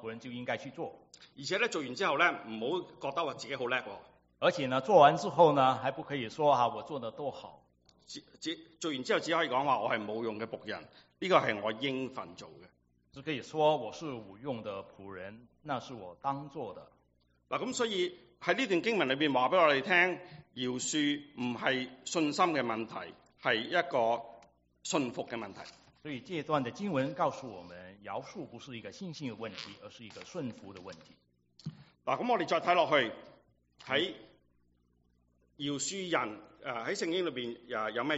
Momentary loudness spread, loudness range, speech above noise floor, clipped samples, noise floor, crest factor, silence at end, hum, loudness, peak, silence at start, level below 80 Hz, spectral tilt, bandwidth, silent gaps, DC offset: 21 LU; 11 LU; 39 dB; under 0.1%; -72 dBFS; 24 dB; 0 s; 60 Hz at -70 dBFS; -32 LUFS; -10 dBFS; 0 s; -74 dBFS; -2.5 dB/octave; 8 kHz; none; under 0.1%